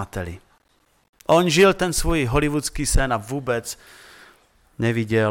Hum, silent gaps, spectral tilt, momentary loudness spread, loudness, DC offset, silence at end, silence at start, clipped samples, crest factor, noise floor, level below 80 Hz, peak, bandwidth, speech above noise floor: none; 1.09-1.13 s; -4.5 dB/octave; 17 LU; -21 LUFS; under 0.1%; 0 s; 0 s; under 0.1%; 18 dB; -63 dBFS; -32 dBFS; -4 dBFS; 17.5 kHz; 43 dB